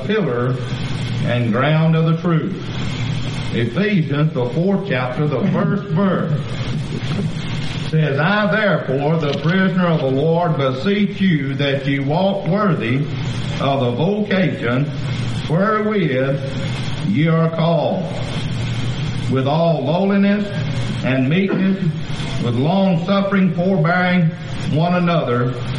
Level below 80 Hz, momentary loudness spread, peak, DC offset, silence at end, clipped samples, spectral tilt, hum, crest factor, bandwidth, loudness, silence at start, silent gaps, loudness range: -42 dBFS; 7 LU; -4 dBFS; 0.6%; 0 s; under 0.1%; -7.5 dB/octave; none; 14 dB; 10 kHz; -18 LUFS; 0 s; none; 2 LU